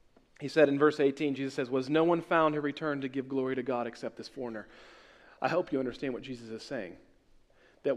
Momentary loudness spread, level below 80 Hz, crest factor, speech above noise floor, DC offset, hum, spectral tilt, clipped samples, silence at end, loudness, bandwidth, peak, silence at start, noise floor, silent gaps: 15 LU; -66 dBFS; 20 dB; 32 dB; under 0.1%; none; -6.5 dB/octave; under 0.1%; 0 s; -31 LUFS; 11 kHz; -12 dBFS; 0.4 s; -62 dBFS; none